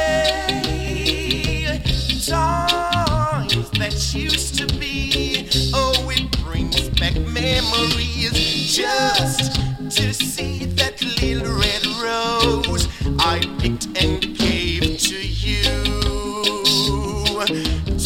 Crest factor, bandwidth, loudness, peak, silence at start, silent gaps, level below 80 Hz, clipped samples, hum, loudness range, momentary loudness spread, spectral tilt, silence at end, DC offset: 18 dB; 17 kHz; -19 LUFS; -2 dBFS; 0 s; none; -28 dBFS; under 0.1%; none; 1 LU; 4 LU; -3.5 dB/octave; 0 s; under 0.1%